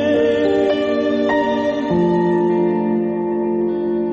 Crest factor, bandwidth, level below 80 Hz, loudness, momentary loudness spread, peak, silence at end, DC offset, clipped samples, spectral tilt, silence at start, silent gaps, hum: 10 dB; 7.4 kHz; -52 dBFS; -18 LUFS; 4 LU; -6 dBFS; 0 s; under 0.1%; under 0.1%; -7.5 dB/octave; 0 s; none; none